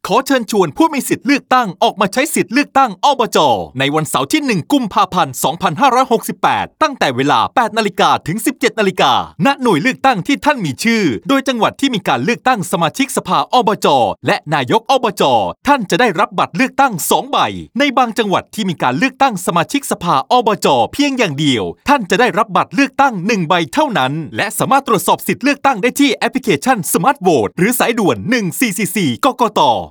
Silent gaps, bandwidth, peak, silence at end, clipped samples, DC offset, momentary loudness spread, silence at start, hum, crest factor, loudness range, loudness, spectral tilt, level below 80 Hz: none; over 20 kHz; 0 dBFS; 0 s; under 0.1%; under 0.1%; 4 LU; 0.05 s; none; 14 dB; 1 LU; -14 LUFS; -4 dB/octave; -52 dBFS